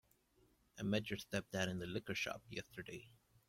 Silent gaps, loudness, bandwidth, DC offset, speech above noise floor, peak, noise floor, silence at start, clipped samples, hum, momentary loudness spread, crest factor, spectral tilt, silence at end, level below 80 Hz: none; -44 LUFS; 16.5 kHz; under 0.1%; 31 dB; -24 dBFS; -75 dBFS; 0.75 s; under 0.1%; none; 12 LU; 22 dB; -4.5 dB/octave; 0.4 s; -72 dBFS